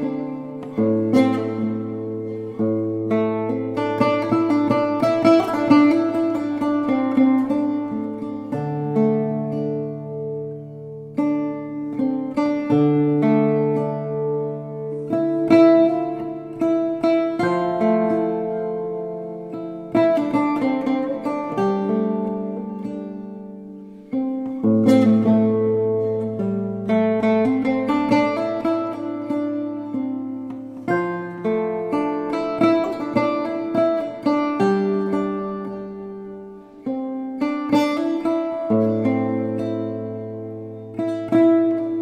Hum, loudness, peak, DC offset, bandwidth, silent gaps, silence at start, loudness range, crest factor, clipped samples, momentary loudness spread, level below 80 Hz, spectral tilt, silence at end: none; -21 LUFS; -2 dBFS; under 0.1%; 9.8 kHz; none; 0 s; 6 LU; 18 dB; under 0.1%; 13 LU; -60 dBFS; -8 dB/octave; 0 s